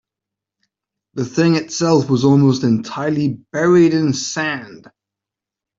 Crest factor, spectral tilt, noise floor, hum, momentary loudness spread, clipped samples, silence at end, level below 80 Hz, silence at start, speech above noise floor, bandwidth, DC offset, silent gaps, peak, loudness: 16 dB; -6 dB/octave; -86 dBFS; none; 10 LU; under 0.1%; 1 s; -58 dBFS; 1.15 s; 70 dB; 7.8 kHz; under 0.1%; none; -2 dBFS; -16 LUFS